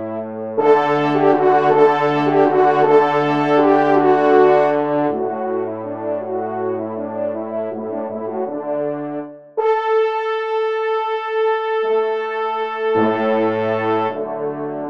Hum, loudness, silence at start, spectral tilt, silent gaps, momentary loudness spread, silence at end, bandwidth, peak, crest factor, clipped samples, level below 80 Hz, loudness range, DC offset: none; -18 LUFS; 0 s; -7.5 dB/octave; none; 11 LU; 0 s; 6.6 kHz; -2 dBFS; 16 dB; under 0.1%; -70 dBFS; 9 LU; 0.2%